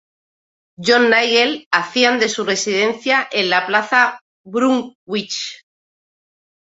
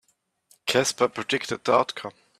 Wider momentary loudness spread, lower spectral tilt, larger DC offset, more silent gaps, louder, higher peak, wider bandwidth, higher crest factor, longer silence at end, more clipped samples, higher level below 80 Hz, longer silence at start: about the same, 12 LU vs 11 LU; about the same, -2.5 dB/octave vs -3 dB/octave; neither; first, 1.66-1.71 s, 4.21-4.44 s, 4.95-5.07 s vs none; first, -16 LUFS vs -24 LUFS; first, 0 dBFS vs -6 dBFS; second, 8 kHz vs 15 kHz; about the same, 18 dB vs 20 dB; first, 1.2 s vs 0.3 s; neither; about the same, -66 dBFS vs -68 dBFS; first, 0.8 s vs 0.65 s